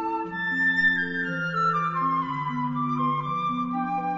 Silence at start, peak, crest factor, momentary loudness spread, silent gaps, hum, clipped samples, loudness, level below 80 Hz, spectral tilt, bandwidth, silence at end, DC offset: 0 s; -12 dBFS; 14 dB; 7 LU; none; none; under 0.1%; -25 LUFS; -60 dBFS; -6.5 dB/octave; 7.6 kHz; 0 s; under 0.1%